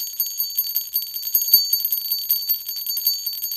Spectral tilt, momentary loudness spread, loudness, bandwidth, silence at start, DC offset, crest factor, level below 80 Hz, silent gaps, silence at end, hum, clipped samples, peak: 4 dB/octave; 8 LU; -19 LUFS; 17 kHz; 0 s; under 0.1%; 22 dB; -64 dBFS; none; 0 s; 50 Hz at -70 dBFS; under 0.1%; 0 dBFS